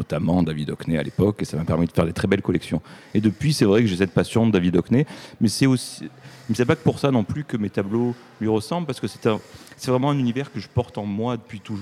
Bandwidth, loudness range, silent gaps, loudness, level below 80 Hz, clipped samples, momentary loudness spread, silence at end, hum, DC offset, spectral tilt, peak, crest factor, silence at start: 15 kHz; 4 LU; none; -22 LUFS; -48 dBFS; under 0.1%; 10 LU; 0 s; none; under 0.1%; -6.5 dB/octave; -2 dBFS; 20 dB; 0 s